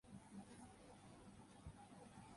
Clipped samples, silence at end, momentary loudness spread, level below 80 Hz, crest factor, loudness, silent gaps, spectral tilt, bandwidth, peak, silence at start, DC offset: under 0.1%; 0 s; 4 LU; -72 dBFS; 16 dB; -62 LUFS; none; -5.5 dB/octave; 11.5 kHz; -44 dBFS; 0.05 s; under 0.1%